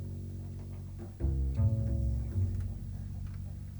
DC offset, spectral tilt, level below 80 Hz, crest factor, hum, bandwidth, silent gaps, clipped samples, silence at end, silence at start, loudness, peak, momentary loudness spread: under 0.1%; -9.5 dB/octave; -38 dBFS; 14 dB; none; over 20 kHz; none; under 0.1%; 0 s; 0 s; -36 LUFS; -20 dBFS; 12 LU